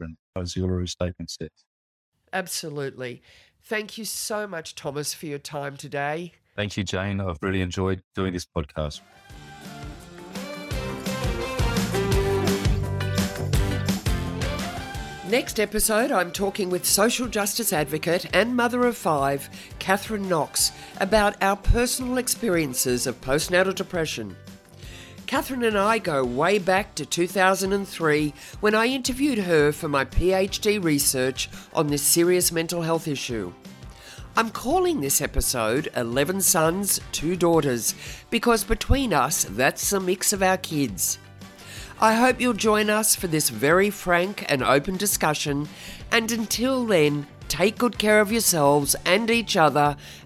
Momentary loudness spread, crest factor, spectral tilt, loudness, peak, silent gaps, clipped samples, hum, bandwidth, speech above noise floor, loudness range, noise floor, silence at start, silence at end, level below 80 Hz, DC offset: 13 LU; 18 dB; -3.5 dB/octave; -23 LUFS; -6 dBFS; 0.19-0.33 s, 1.66-2.12 s, 8.04-8.11 s; under 0.1%; none; 16 kHz; 20 dB; 9 LU; -43 dBFS; 0 s; 0.05 s; -38 dBFS; under 0.1%